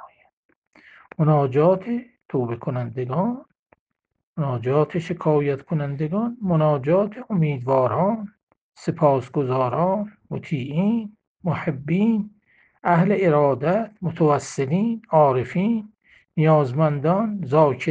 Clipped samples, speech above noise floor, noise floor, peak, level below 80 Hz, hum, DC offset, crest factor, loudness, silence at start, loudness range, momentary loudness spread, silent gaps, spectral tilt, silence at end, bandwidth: under 0.1%; 40 dB; -60 dBFS; -4 dBFS; -60 dBFS; none; under 0.1%; 18 dB; -22 LUFS; 0 s; 4 LU; 11 LU; 0.33-0.49 s, 0.56-0.71 s, 3.59-3.66 s, 3.79-3.86 s, 4.23-4.36 s, 8.43-8.47 s, 8.61-8.72 s, 11.27-11.35 s; -8.5 dB/octave; 0 s; 8.8 kHz